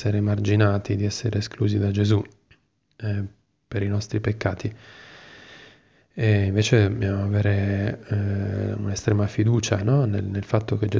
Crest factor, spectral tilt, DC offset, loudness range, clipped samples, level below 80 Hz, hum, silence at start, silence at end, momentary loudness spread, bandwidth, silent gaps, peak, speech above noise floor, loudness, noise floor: 18 dB; -6.5 dB/octave; under 0.1%; 7 LU; under 0.1%; -42 dBFS; none; 0 s; 0 s; 15 LU; 7.6 kHz; none; -6 dBFS; 38 dB; -24 LUFS; -61 dBFS